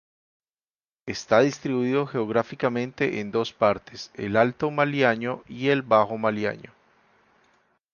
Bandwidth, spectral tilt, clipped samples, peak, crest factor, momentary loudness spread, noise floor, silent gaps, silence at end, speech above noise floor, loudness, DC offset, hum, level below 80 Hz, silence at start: 7.2 kHz; -6 dB/octave; under 0.1%; -4 dBFS; 22 dB; 11 LU; under -90 dBFS; none; 1.3 s; over 66 dB; -24 LUFS; under 0.1%; none; -62 dBFS; 1.05 s